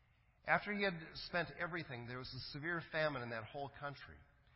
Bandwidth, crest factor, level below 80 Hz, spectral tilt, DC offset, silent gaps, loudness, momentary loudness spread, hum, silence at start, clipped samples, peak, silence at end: 5.8 kHz; 24 dB; -68 dBFS; -8 dB/octave; under 0.1%; none; -42 LUFS; 12 LU; none; 0.45 s; under 0.1%; -18 dBFS; 0.35 s